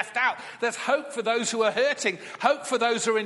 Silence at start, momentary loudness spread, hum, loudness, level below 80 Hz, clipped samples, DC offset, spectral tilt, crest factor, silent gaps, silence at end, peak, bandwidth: 0 s; 5 LU; none; -25 LUFS; -80 dBFS; under 0.1%; under 0.1%; -2 dB/octave; 20 dB; none; 0 s; -6 dBFS; 11.5 kHz